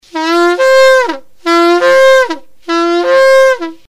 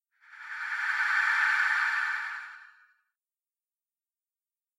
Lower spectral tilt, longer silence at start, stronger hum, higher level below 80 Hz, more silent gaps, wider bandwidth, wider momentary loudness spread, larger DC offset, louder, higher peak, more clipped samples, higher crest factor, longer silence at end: first, -2 dB/octave vs 3 dB/octave; second, 0.15 s vs 0.3 s; neither; first, -54 dBFS vs -88 dBFS; neither; about the same, 15 kHz vs 14.5 kHz; second, 11 LU vs 17 LU; neither; first, -9 LUFS vs -27 LUFS; first, 0 dBFS vs -14 dBFS; first, 0.8% vs under 0.1%; second, 8 dB vs 18 dB; second, 0.1 s vs 2.1 s